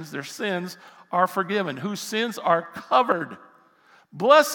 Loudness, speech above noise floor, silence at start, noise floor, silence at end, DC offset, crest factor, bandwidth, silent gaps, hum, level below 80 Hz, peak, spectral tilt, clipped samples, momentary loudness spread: -24 LUFS; 34 dB; 0 s; -57 dBFS; 0 s; under 0.1%; 22 dB; 18 kHz; none; none; -80 dBFS; -2 dBFS; -4 dB/octave; under 0.1%; 12 LU